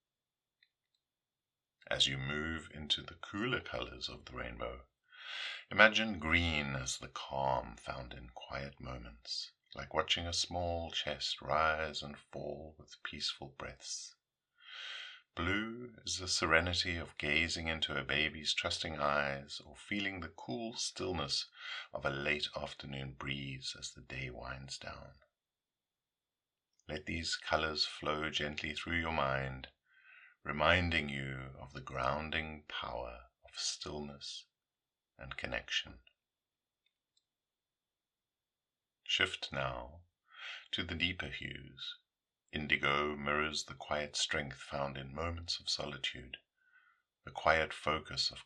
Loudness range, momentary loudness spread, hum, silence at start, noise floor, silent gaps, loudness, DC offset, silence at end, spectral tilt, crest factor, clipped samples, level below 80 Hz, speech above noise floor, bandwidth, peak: 10 LU; 16 LU; none; 1.85 s; under -90 dBFS; none; -36 LUFS; under 0.1%; 0 s; -3 dB/octave; 32 dB; under 0.1%; -60 dBFS; over 52 dB; 11.5 kHz; -6 dBFS